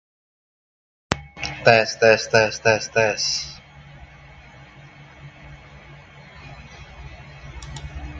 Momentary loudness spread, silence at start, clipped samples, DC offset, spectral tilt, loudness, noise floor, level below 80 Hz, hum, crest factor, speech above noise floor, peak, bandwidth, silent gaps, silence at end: 26 LU; 1.1 s; under 0.1%; under 0.1%; -3 dB/octave; -19 LUFS; -45 dBFS; -44 dBFS; none; 24 dB; 27 dB; 0 dBFS; 9 kHz; none; 0 s